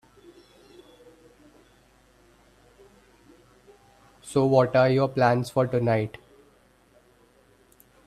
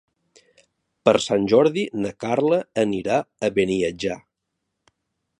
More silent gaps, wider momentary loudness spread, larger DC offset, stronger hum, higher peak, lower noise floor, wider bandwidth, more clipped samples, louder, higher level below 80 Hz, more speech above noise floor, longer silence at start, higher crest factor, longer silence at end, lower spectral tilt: neither; first, 14 LU vs 9 LU; neither; first, 50 Hz at -60 dBFS vs none; second, -6 dBFS vs -2 dBFS; second, -60 dBFS vs -79 dBFS; first, 13.5 kHz vs 11 kHz; neither; about the same, -23 LUFS vs -21 LUFS; about the same, -62 dBFS vs -58 dBFS; second, 38 dB vs 58 dB; first, 4.25 s vs 1.05 s; about the same, 22 dB vs 22 dB; first, 2 s vs 1.2 s; first, -7 dB/octave vs -5.5 dB/octave